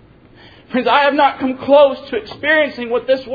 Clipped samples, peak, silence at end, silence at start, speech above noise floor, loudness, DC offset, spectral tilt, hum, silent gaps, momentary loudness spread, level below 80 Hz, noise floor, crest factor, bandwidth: under 0.1%; 0 dBFS; 0 s; 0.7 s; 29 dB; -15 LUFS; under 0.1%; -6 dB/octave; none; none; 11 LU; -52 dBFS; -44 dBFS; 16 dB; 5 kHz